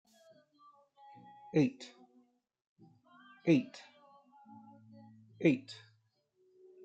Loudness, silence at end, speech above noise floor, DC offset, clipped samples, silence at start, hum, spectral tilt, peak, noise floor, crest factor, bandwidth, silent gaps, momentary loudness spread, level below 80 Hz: -33 LUFS; 1.1 s; 43 dB; under 0.1%; under 0.1%; 1.55 s; none; -7.5 dB/octave; -16 dBFS; -75 dBFS; 22 dB; 8.4 kHz; 2.67-2.76 s; 27 LU; -84 dBFS